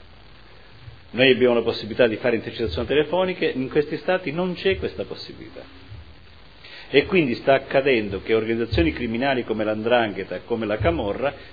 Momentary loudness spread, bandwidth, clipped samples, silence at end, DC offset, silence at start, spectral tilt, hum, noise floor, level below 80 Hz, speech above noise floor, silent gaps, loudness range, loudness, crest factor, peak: 14 LU; 5 kHz; under 0.1%; 0 s; 0.4%; 0.85 s; -8 dB/octave; none; -48 dBFS; -42 dBFS; 26 dB; none; 5 LU; -22 LUFS; 22 dB; 0 dBFS